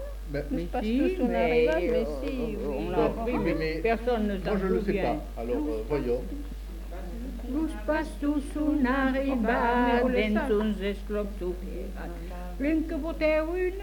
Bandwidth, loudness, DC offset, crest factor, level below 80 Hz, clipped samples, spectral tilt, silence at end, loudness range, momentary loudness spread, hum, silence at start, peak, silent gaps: 19 kHz; -28 LUFS; under 0.1%; 16 dB; -36 dBFS; under 0.1%; -7 dB/octave; 0 s; 5 LU; 13 LU; none; 0 s; -12 dBFS; none